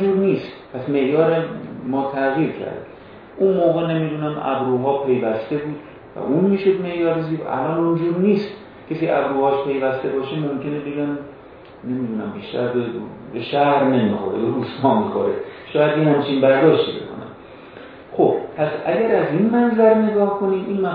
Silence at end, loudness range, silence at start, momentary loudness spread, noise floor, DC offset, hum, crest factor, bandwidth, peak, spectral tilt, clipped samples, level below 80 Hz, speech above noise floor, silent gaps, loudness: 0 s; 4 LU; 0 s; 15 LU; -41 dBFS; under 0.1%; none; 18 dB; 5.2 kHz; 0 dBFS; -10 dB/octave; under 0.1%; -58 dBFS; 23 dB; none; -20 LUFS